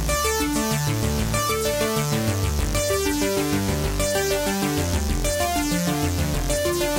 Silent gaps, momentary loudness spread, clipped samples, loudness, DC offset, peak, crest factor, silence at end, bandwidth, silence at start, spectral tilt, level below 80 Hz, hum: none; 2 LU; under 0.1%; -23 LUFS; under 0.1%; -10 dBFS; 14 dB; 0 s; 17 kHz; 0 s; -4 dB/octave; -30 dBFS; none